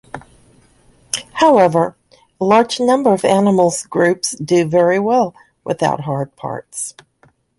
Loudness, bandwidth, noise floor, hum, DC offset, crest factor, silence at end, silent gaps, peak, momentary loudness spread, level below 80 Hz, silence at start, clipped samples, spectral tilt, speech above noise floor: -16 LUFS; 11.5 kHz; -55 dBFS; none; under 0.1%; 16 dB; 0.7 s; none; -2 dBFS; 13 LU; -56 dBFS; 0.15 s; under 0.1%; -5 dB/octave; 41 dB